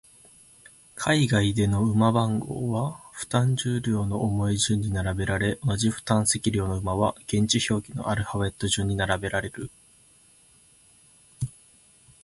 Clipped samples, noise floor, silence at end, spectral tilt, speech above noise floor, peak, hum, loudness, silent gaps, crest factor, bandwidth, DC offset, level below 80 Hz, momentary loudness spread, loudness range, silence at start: under 0.1%; -57 dBFS; 0.75 s; -5 dB/octave; 33 dB; -8 dBFS; none; -25 LUFS; none; 18 dB; 11.5 kHz; under 0.1%; -46 dBFS; 10 LU; 6 LU; 0.95 s